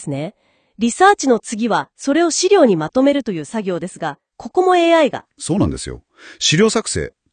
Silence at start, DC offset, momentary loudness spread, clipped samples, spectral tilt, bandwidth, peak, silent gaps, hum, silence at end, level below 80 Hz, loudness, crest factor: 0 s; under 0.1%; 15 LU; under 0.1%; -4 dB/octave; 10 kHz; 0 dBFS; none; none; 0.25 s; -46 dBFS; -16 LUFS; 16 dB